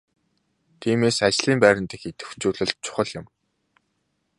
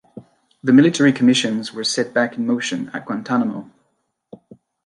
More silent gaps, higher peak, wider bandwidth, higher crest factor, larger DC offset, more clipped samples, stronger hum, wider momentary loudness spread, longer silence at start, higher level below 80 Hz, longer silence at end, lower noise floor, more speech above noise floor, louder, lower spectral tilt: neither; about the same, -2 dBFS vs -2 dBFS; about the same, 11.5 kHz vs 11 kHz; first, 24 dB vs 18 dB; neither; neither; neither; first, 16 LU vs 13 LU; first, 0.8 s vs 0.15 s; first, -56 dBFS vs -68 dBFS; about the same, 1.15 s vs 1.25 s; about the same, -73 dBFS vs -70 dBFS; about the same, 51 dB vs 52 dB; second, -22 LUFS vs -18 LUFS; about the same, -4 dB/octave vs -4.5 dB/octave